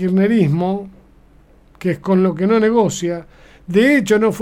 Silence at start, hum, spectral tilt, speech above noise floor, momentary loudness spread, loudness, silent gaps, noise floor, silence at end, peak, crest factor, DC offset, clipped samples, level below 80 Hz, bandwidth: 0 s; 50 Hz at -50 dBFS; -6.5 dB/octave; 33 dB; 11 LU; -16 LUFS; none; -48 dBFS; 0 s; -2 dBFS; 14 dB; under 0.1%; under 0.1%; -48 dBFS; 14.5 kHz